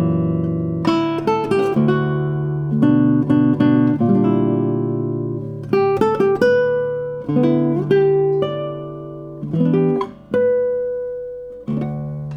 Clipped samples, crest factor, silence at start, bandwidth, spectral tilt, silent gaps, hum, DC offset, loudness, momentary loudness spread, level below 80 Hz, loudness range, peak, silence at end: under 0.1%; 16 dB; 0 s; 8.8 kHz; -9 dB/octave; none; none; under 0.1%; -18 LUFS; 11 LU; -50 dBFS; 4 LU; -2 dBFS; 0 s